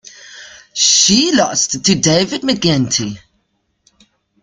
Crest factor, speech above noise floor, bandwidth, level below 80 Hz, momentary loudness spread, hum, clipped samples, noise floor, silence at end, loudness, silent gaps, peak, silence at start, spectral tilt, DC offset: 16 dB; 51 dB; 11 kHz; -48 dBFS; 18 LU; none; under 0.1%; -65 dBFS; 1.25 s; -12 LUFS; none; 0 dBFS; 0.25 s; -3 dB/octave; under 0.1%